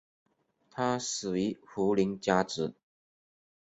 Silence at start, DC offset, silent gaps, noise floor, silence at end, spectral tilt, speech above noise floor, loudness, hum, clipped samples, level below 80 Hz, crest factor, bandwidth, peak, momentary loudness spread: 0.75 s; under 0.1%; none; -65 dBFS; 1.05 s; -4.5 dB/octave; 35 dB; -31 LUFS; none; under 0.1%; -66 dBFS; 22 dB; 8.2 kHz; -10 dBFS; 7 LU